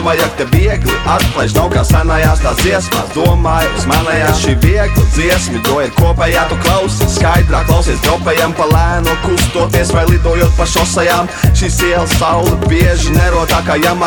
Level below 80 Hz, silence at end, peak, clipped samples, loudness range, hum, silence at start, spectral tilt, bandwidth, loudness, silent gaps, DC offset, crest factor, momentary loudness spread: -16 dBFS; 0 s; 0 dBFS; under 0.1%; 1 LU; none; 0 s; -5 dB/octave; 19.5 kHz; -11 LUFS; none; under 0.1%; 10 dB; 2 LU